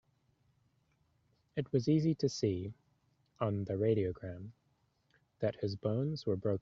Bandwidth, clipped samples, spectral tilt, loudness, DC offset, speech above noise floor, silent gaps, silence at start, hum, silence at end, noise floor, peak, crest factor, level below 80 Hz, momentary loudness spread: 7.6 kHz; under 0.1%; -8 dB/octave; -35 LUFS; under 0.1%; 42 dB; none; 1.55 s; none; 0 s; -76 dBFS; -18 dBFS; 18 dB; -68 dBFS; 14 LU